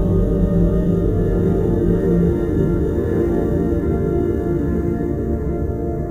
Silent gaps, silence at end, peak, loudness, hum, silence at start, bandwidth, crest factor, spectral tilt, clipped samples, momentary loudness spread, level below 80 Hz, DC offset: none; 0 s; -4 dBFS; -19 LUFS; none; 0 s; 7.2 kHz; 12 dB; -10.5 dB/octave; under 0.1%; 5 LU; -24 dBFS; under 0.1%